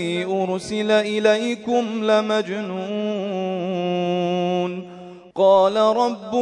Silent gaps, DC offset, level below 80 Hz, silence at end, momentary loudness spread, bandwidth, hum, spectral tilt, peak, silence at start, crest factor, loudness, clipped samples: none; under 0.1%; -66 dBFS; 0 s; 10 LU; 11 kHz; none; -5.5 dB/octave; -4 dBFS; 0 s; 16 dB; -21 LUFS; under 0.1%